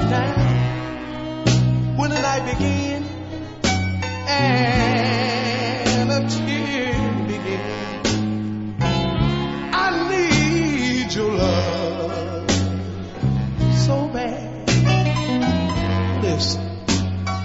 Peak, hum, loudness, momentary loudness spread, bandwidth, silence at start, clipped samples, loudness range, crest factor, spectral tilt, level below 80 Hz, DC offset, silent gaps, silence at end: -2 dBFS; none; -21 LUFS; 8 LU; 8 kHz; 0 s; under 0.1%; 2 LU; 18 dB; -5.5 dB/octave; -36 dBFS; under 0.1%; none; 0 s